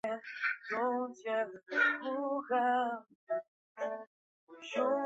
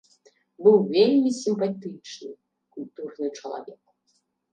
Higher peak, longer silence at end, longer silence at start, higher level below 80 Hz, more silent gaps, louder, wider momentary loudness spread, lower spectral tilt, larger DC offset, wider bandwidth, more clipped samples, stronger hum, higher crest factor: second, -18 dBFS vs -6 dBFS; second, 0 s vs 0.8 s; second, 0.05 s vs 0.6 s; about the same, -84 dBFS vs -80 dBFS; first, 3.15-3.27 s, 3.48-3.75 s, 4.07-4.47 s vs none; second, -35 LUFS vs -22 LUFS; second, 10 LU vs 21 LU; second, -0.5 dB/octave vs -6 dB/octave; neither; second, 8 kHz vs 9.2 kHz; neither; neither; about the same, 18 dB vs 20 dB